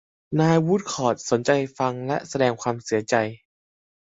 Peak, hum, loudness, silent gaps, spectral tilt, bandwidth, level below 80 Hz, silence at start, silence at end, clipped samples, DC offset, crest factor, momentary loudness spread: -4 dBFS; none; -23 LUFS; none; -5.5 dB/octave; 8 kHz; -62 dBFS; 0.3 s; 0.7 s; under 0.1%; under 0.1%; 20 dB; 8 LU